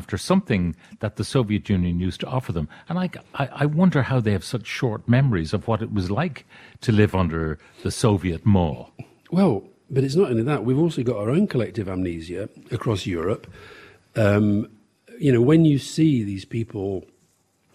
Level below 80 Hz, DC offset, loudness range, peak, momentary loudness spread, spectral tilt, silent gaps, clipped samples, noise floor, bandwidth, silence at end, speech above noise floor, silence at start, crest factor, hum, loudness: -46 dBFS; under 0.1%; 4 LU; -4 dBFS; 11 LU; -7 dB/octave; none; under 0.1%; -64 dBFS; 14 kHz; 0.75 s; 43 dB; 0 s; 18 dB; none; -23 LUFS